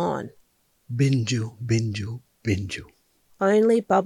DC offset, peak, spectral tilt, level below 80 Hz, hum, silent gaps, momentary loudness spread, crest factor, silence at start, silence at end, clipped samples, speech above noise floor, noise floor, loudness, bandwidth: under 0.1%; -8 dBFS; -6.5 dB/octave; -58 dBFS; none; none; 15 LU; 18 dB; 0 s; 0 s; under 0.1%; 41 dB; -64 dBFS; -24 LUFS; 12 kHz